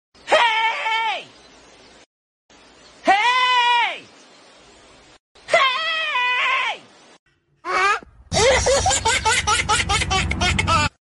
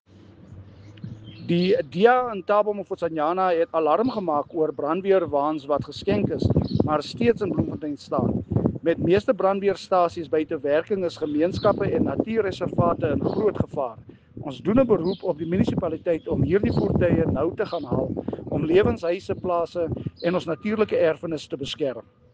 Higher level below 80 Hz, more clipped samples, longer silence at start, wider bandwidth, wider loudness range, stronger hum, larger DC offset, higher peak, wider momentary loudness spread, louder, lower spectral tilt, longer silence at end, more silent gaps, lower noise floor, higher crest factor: first, -38 dBFS vs -48 dBFS; neither; second, 0.25 s vs 0.5 s; first, 11.5 kHz vs 9 kHz; about the same, 4 LU vs 2 LU; neither; neither; about the same, -4 dBFS vs -4 dBFS; about the same, 9 LU vs 8 LU; first, -18 LUFS vs -24 LUFS; second, -2 dB/octave vs -8 dB/octave; second, 0.15 s vs 0.35 s; first, 2.06-2.49 s, 5.20-5.35 s, 7.19-7.26 s vs none; about the same, -49 dBFS vs -48 dBFS; about the same, 18 dB vs 20 dB